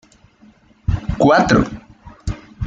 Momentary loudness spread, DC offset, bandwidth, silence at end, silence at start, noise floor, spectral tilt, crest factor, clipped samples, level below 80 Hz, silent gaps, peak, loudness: 17 LU; under 0.1%; 9 kHz; 0 s; 0.9 s; -50 dBFS; -6.5 dB/octave; 18 dB; under 0.1%; -32 dBFS; none; -2 dBFS; -16 LUFS